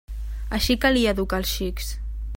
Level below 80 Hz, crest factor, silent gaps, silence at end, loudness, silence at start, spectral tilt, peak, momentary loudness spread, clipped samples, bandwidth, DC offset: -30 dBFS; 18 dB; none; 0 s; -23 LUFS; 0.1 s; -4.5 dB/octave; -6 dBFS; 14 LU; under 0.1%; 16.5 kHz; under 0.1%